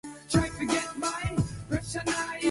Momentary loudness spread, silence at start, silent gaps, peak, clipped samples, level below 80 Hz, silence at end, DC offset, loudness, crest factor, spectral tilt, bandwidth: 4 LU; 0.05 s; none; -12 dBFS; under 0.1%; -44 dBFS; 0 s; under 0.1%; -30 LUFS; 18 dB; -4.5 dB/octave; 11.5 kHz